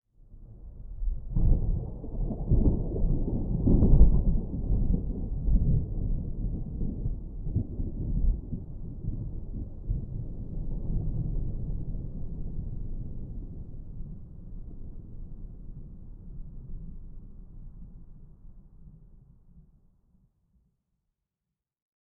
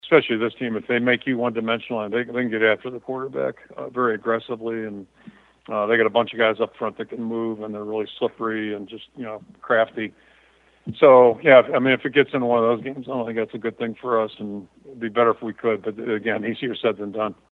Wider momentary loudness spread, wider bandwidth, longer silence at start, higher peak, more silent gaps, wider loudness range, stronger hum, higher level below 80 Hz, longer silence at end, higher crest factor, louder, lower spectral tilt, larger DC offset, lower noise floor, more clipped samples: first, 21 LU vs 15 LU; second, 1.2 kHz vs 4.3 kHz; first, 0.3 s vs 0.05 s; second, -6 dBFS vs 0 dBFS; neither; first, 21 LU vs 9 LU; neither; first, -30 dBFS vs -68 dBFS; first, 2.4 s vs 0.2 s; about the same, 22 dB vs 22 dB; second, -32 LUFS vs -22 LUFS; first, -15 dB/octave vs -8 dB/octave; neither; first, -88 dBFS vs -57 dBFS; neither